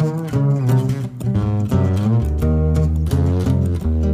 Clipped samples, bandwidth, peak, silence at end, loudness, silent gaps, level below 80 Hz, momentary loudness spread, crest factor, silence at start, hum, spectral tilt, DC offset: under 0.1%; 15 kHz; -6 dBFS; 0 s; -18 LUFS; none; -24 dBFS; 3 LU; 12 dB; 0 s; none; -9 dB/octave; under 0.1%